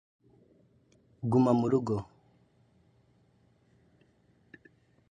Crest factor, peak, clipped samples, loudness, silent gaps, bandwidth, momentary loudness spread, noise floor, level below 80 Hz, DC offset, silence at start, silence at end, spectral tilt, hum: 22 dB; -12 dBFS; under 0.1%; -28 LUFS; none; 9.4 kHz; 13 LU; -67 dBFS; -66 dBFS; under 0.1%; 1.2 s; 3.05 s; -9 dB/octave; none